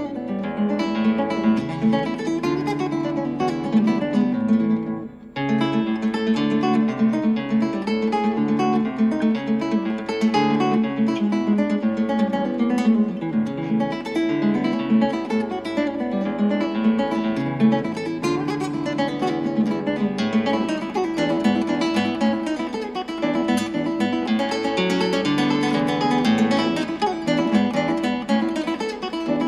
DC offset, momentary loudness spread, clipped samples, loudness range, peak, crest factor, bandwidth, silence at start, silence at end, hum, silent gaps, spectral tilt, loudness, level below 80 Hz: under 0.1%; 5 LU; under 0.1%; 2 LU; -6 dBFS; 16 dB; 11.5 kHz; 0 s; 0 s; none; none; -6.5 dB/octave; -22 LUFS; -56 dBFS